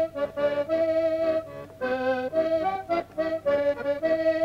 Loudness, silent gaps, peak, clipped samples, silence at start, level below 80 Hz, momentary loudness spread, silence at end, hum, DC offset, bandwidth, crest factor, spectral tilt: -26 LUFS; none; -14 dBFS; under 0.1%; 0 s; -60 dBFS; 5 LU; 0 s; none; under 0.1%; 8 kHz; 12 dB; -6.5 dB/octave